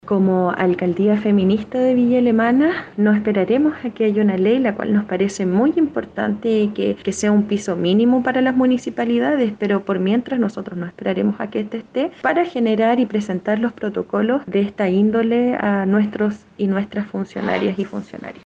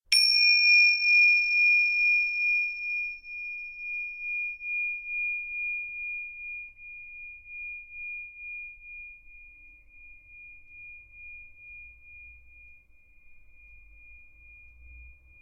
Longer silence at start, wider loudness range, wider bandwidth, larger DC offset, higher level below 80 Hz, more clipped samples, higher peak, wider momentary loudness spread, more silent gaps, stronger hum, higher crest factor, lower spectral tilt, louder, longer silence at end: about the same, 0.05 s vs 0.1 s; second, 3 LU vs 26 LU; second, 9.2 kHz vs 16 kHz; neither; about the same, -58 dBFS vs -60 dBFS; neither; first, -4 dBFS vs -8 dBFS; second, 7 LU vs 27 LU; neither; neither; second, 14 dB vs 20 dB; first, -7 dB/octave vs 3.5 dB/octave; first, -19 LUFS vs -23 LUFS; second, 0.15 s vs 0.3 s